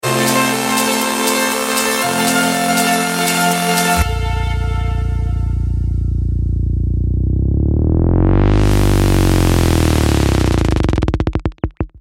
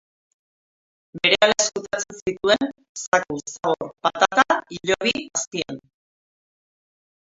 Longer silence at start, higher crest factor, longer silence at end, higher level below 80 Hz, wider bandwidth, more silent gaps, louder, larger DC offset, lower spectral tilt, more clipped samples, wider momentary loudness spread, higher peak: second, 0.05 s vs 1.15 s; second, 14 dB vs 24 dB; second, 0 s vs 1.6 s; first, -20 dBFS vs -60 dBFS; first, 17 kHz vs 8 kHz; second, none vs 2.22-2.26 s, 2.89-2.95 s, 3.07-3.12 s, 5.47-5.51 s; first, -15 LUFS vs -21 LUFS; neither; first, -4.5 dB/octave vs -2 dB/octave; neither; second, 6 LU vs 12 LU; about the same, 0 dBFS vs 0 dBFS